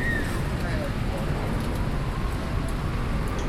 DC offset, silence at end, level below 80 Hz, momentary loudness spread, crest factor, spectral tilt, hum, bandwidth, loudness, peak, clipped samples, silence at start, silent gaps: under 0.1%; 0 s; -30 dBFS; 2 LU; 12 dB; -6.5 dB/octave; none; 15.5 kHz; -29 LUFS; -14 dBFS; under 0.1%; 0 s; none